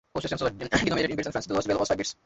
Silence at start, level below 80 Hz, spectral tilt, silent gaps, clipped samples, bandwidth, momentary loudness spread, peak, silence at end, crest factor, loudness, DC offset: 0.15 s; -50 dBFS; -4.5 dB/octave; none; under 0.1%; 8.2 kHz; 5 LU; -8 dBFS; 0.15 s; 20 dB; -27 LUFS; under 0.1%